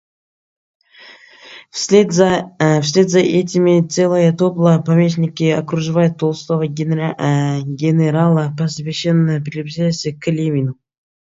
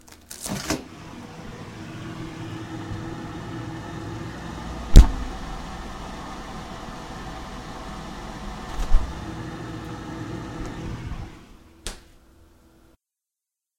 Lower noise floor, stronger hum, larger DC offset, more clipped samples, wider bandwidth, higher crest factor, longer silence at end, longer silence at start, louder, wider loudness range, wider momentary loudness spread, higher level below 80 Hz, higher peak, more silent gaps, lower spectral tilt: second, -43 dBFS vs -87 dBFS; neither; neither; neither; second, 7.8 kHz vs 16.5 kHz; second, 16 dB vs 26 dB; second, 0.5 s vs 1.8 s; first, 1 s vs 0.05 s; first, -16 LUFS vs -29 LUFS; second, 3 LU vs 12 LU; second, 7 LU vs 10 LU; second, -56 dBFS vs -26 dBFS; about the same, 0 dBFS vs 0 dBFS; neither; about the same, -6.5 dB/octave vs -5.5 dB/octave